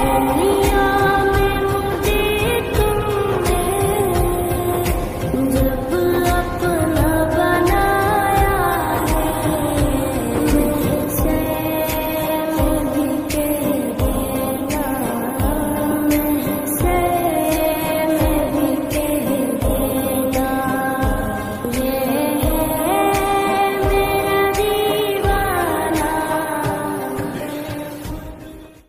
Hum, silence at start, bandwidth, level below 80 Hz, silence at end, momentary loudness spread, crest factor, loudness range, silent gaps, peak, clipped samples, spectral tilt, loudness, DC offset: none; 0 s; 15.5 kHz; -28 dBFS; 0.15 s; 5 LU; 14 dB; 3 LU; none; -4 dBFS; under 0.1%; -5.5 dB/octave; -18 LUFS; under 0.1%